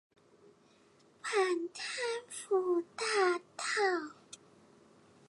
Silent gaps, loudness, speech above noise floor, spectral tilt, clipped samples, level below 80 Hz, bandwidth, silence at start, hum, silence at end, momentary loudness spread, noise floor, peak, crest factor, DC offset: none; -34 LUFS; 32 dB; -1.5 dB/octave; under 0.1%; -86 dBFS; 11.5 kHz; 1.25 s; none; 0.95 s; 15 LU; -65 dBFS; -18 dBFS; 18 dB; under 0.1%